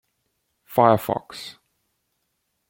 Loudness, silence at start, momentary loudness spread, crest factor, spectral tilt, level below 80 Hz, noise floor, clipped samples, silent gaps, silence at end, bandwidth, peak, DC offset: -21 LUFS; 0.7 s; 19 LU; 24 dB; -6.5 dB/octave; -64 dBFS; -75 dBFS; under 0.1%; none; 1.2 s; 17 kHz; -2 dBFS; under 0.1%